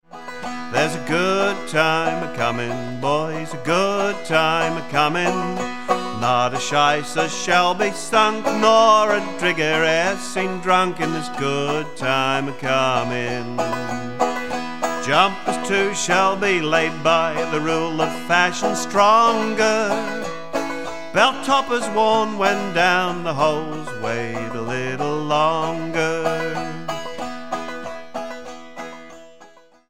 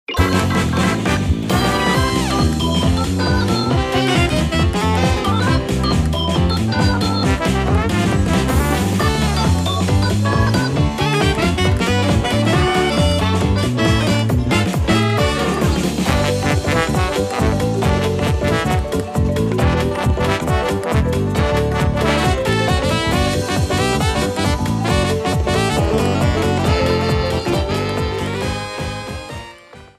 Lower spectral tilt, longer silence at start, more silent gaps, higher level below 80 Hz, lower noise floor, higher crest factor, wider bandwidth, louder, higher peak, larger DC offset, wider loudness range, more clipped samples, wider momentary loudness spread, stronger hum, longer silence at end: second, -4 dB/octave vs -5.5 dB/octave; about the same, 0 s vs 0.1 s; neither; second, -60 dBFS vs -26 dBFS; first, -49 dBFS vs -40 dBFS; about the same, 20 dB vs 16 dB; about the same, 16.5 kHz vs 15.5 kHz; second, -20 LUFS vs -17 LUFS; about the same, 0 dBFS vs 0 dBFS; first, 2% vs under 0.1%; first, 5 LU vs 2 LU; neither; first, 11 LU vs 3 LU; neither; second, 0 s vs 0.15 s